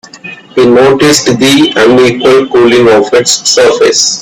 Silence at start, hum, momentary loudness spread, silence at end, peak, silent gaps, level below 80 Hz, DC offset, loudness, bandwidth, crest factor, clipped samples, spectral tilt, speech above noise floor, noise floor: 0.15 s; none; 3 LU; 0 s; 0 dBFS; none; -42 dBFS; under 0.1%; -5 LUFS; over 20 kHz; 6 dB; 0.7%; -3 dB/octave; 22 dB; -27 dBFS